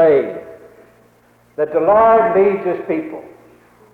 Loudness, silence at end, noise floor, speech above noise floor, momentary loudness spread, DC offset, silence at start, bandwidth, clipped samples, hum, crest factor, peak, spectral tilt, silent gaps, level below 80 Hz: -15 LUFS; 0.65 s; -52 dBFS; 38 dB; 21 LU; under 0.1%; 0 s; 4.3 kHz; under 0.1%; none; 12 dB; -4 dBFS; -8.5 dB/octave; none; -54 dBFS